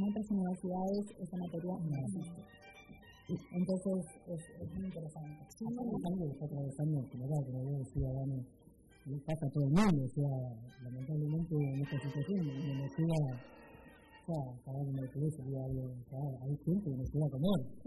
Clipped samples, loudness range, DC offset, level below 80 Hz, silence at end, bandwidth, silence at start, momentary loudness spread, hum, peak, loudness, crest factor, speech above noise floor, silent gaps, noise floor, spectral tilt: under 0.1%; 5 LU; under 0.1%; -58 dBFS; 0 s; 12 kHz; 0 s; 15 LU; none; -18 dBFS; -38 LUFS; 20 dB; 21 dB; none; -59 dBFS; -8.5 dB/octave